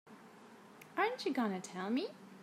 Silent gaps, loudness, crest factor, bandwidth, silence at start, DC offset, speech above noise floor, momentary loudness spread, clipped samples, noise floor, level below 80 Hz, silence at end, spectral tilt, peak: none; -38 LUFS; 18 dB; 15 kHz; 0.05 s; under 0.1%; 21 dB; 22 LU; under 0.1%; -58 dBFS; under -90 dBFS; 0 s; -5 dB/octave; -22 dBFS